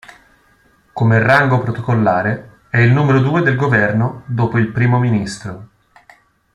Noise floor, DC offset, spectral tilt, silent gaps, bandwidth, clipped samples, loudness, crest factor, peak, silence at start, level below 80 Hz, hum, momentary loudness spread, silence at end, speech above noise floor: -54 dBFS; under 0.1%; -7.5 dB/octave; none; 10.5 kHz; under 0.1%; -15 LUFS; 16 dB; 0 dBFS; 0.95 s; -50 dBFS; none; 14 LU; 0.9 s; 40 dB